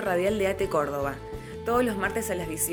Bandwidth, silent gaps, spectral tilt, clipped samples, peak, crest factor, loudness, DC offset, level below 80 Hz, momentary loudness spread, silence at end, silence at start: over 20 kHz; none; -4.5 dB/octave; under 0.1%; -12 dBFS; 14 dB; -27 LUFS; under 0.1%; -46 dBFS; 9 LU; 0 s; 0 s